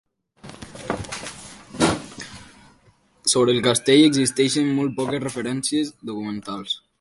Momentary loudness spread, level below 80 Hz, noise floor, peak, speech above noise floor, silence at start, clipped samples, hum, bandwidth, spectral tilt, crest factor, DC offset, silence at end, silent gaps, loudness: 21 LU; -52 dBFS; -58 dBFS; -2 dBFS; 37 dB; 0.45 s; under 0.1%; none; 11.5 kHz; -4 dB/octave; 20 dB; under 0.1%; 0.2 s; none; -21 LUFS